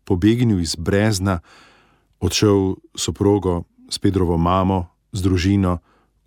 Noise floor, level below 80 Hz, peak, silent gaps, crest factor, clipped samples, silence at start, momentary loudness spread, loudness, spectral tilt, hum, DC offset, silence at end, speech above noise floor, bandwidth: -56 dBFS; -38 dBFS; -4 dBFS; none; 16 dB; under 0.1%; 0.05 s; 10 LU; -19 LUFS; -6 dB/octave; none; under 0.1%; 0.45 s; 38 dB; 17 kHz